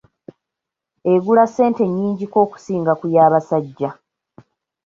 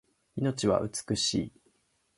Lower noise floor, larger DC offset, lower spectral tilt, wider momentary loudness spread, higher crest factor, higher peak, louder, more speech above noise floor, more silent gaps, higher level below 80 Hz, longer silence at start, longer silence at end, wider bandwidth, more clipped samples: first, -84 dBFS vs -71 dBFS; neither; first, -8.5 dB/octave vs -4.5 dB/octave; about the same, 11 LU vs 11 LU; about the same, 16 dB vs 20 dB; first, -2 dBFS vs -12 dBFS; first, -17 LUFS vs -30 LUFS; first, 67 dB vs 42 dB; neither; second, -64 dBFS vs -58 dBFS; first, 1.05 s vs 0.35 s; first, 0.9 s vs 0.7 s; second, 7.6 kHz vs 11.5 kHz; neither